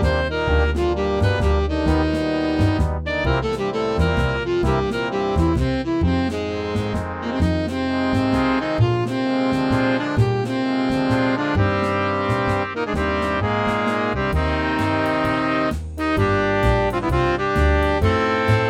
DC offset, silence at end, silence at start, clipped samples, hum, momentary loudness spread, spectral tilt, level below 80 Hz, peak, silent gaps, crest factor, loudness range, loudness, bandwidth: under 0.1%; 0 s; 0 s; under 0.1%; none; 4 LU; -7 dB/octave; -28 dBFS; -4 dBFS; none; 14 dB; 2 LU; -20 LUFS; 11.5 kHz